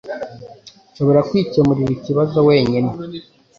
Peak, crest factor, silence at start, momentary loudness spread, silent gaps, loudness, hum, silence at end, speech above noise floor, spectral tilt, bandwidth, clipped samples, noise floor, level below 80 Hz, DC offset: -2 dBFS; 16 dB; 0.05 s; 18 LU; none; -16 LUFS; none; 0.35 s; 28 dB; -8.5 dB/octave; 7.2 kHz; under 0.1%; -43 dBFS; -50 dBFS; under 0.1%